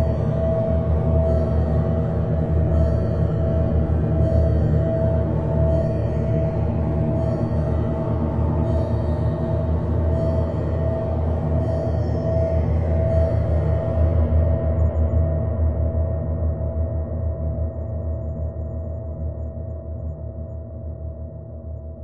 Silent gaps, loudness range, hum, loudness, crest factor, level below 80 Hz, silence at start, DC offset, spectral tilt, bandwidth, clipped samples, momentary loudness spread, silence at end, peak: none; 8 LU; none; -22 LUFS; 14 dB; -28 dBFS; 0 s; 0.9%; -11 dB/octave; 4.6 kHz; under 0.1%; 11 LU; 0 s; -6 dBFS